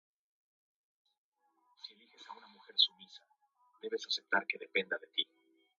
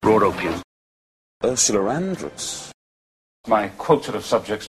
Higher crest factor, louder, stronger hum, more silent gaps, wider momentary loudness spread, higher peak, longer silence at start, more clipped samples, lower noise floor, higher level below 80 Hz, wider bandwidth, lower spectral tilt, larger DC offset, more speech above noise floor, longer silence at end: first, 28 dB vs 20 dB; second, -34 LUFS vs -21 LUFS; neither; second, none vs 0.64-1.40 s, 2.74-3.44 s; first, 23 LU vs 13 LU; second, -14 dBFS vs -4 dBFS; first, 1.85 s vs 0 s; neither; second, -75 dBFS vs under -90 dBFS; second, under -90 dBFS vs -52 dBFS; second, 7.8 kHz vs 13 kHz; second, -1.5 dB/octave vs -3.5 dB/octave; neither; second, 38 dB vs over 69 dB; first, 0.55 s vs 0.05 s